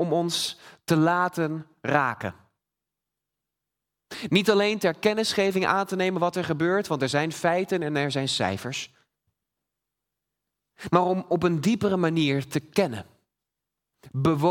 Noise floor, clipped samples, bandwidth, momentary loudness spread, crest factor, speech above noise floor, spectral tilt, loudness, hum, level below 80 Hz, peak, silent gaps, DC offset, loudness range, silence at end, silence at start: -87 dBFS; under 0.1%; 18 kHz; 11 LU; 22 dB; 62 dB; -5 dB/octave; -25 LUFS; 50 Hz at -60 dBFS; -64 dBFS; -4 dBFS; none; under 0.1%; 5 LU; 0 s; 0 s